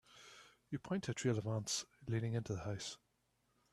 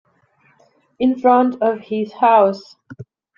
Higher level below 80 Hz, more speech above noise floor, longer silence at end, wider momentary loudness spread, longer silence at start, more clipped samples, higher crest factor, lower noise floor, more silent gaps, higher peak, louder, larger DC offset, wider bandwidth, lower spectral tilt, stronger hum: second, -70 dBFS vs -62 dBFS; about the same, 40 dB vs 42 dB; first, 0.75 s vs 0.35 s; first, 19 LU vs 11 LU; second, 0.1 s vs 1 s; neither; about the same, 20 dB vs 16 dB; first, -80 dBFS vs -58 dBFS; neither; second, -24 dBFS vs -2 dBFS; second, -41 LUFS vs -16 LUFS; neither; first, 13 kHz vs 7 kHz; second, -5 dB/octave vs -7.5 dB/octave; neither